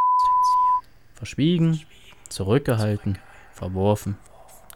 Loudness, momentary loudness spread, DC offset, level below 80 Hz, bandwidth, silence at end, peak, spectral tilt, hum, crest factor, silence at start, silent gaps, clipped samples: -22 LUFS; 17 LU; 0.3%; -50 dBFS; 16.5 kHz; 0.6 s; -8 dBFS; -6.5 dB/octave; none; 16 dB; 0 s; none; under 0.1%